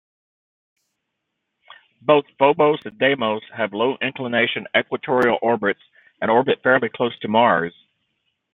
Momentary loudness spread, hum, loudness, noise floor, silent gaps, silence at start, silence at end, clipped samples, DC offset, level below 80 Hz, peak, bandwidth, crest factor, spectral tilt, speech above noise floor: 8 LU; none; -20 LUFS; -78 dBFS; none; 2.05 s; 0.85 s; under 0.1%; under 0.1%; -66 dBFS; -2 dBFS; 5.6 kHz; 20 dB; -7 dB/octave; 58 dB